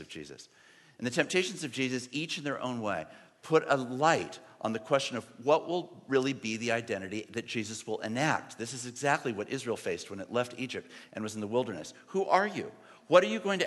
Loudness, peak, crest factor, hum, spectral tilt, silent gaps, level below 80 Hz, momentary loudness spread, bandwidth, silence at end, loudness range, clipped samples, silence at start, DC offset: -32 LUFS; -8 dBFS; 24 dB; none; -4 dB/octave; none; -78 dBFS; 12 LU; 12.5 kHz; 0 s; 3 LU; under 0.1%; 0 s; under 0.1%